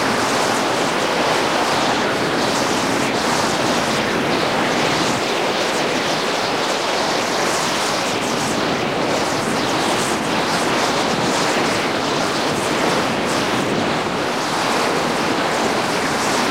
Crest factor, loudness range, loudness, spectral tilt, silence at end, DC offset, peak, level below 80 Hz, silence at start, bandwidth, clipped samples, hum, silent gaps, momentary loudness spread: 14 dB; 1 LU; -18 LUFS; -3 dB/octave; 0 s; 0.2%; -4 dBFS; -50 dBFS; 0 s; 16 kHz; under 0.1%; none; none; 2 LU